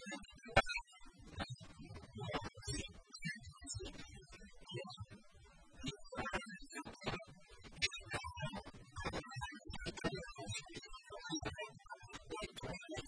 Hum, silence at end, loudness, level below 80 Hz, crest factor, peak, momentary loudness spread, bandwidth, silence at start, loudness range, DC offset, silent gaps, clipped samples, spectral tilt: none; 0 s; -45 LUFS; -58 dBFS; 30 dB; -16 dBFS; 16 LU; 11 kHz; 0 s; 6 LU; under 0.1%; none; under 0.1%; -3.5 dB/octave